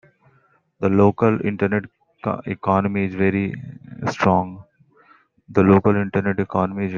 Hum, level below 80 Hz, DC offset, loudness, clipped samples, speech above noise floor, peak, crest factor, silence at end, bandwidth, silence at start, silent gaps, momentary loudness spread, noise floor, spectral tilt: none; -56 dBFS; under 0.1%; -20 LUFS; under 0.1%; 41 dB; -2 dBFS; 20 dB; 0 s; 7.2 kHz; 0.8 s; none; 12 LU; -60 dBFS; -8.5 dB/octave